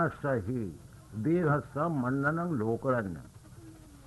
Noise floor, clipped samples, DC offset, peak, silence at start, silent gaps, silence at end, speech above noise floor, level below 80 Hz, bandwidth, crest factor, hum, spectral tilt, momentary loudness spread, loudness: -51 dBFS; under 0.1%; under 0.1%; -16 dBFS; 0 s; none; 0 s; 20 dB; -58 dBFS; 12 kHz; 16 dB; none; -9 dB/octave; 23 LU; -31 LUFS